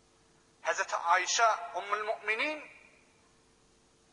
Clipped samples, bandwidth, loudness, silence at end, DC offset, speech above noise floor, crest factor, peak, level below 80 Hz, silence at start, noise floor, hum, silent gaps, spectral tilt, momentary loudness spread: under 0.1%; 11 kHz; -31 LUFS; 1.4 s; under 0.1%; 34 dB; 20 dB; -14 dBFS; -78 dBFS; 0.65 s; -66 dBFS; none; none; 0.5 dB/octave; 11 LU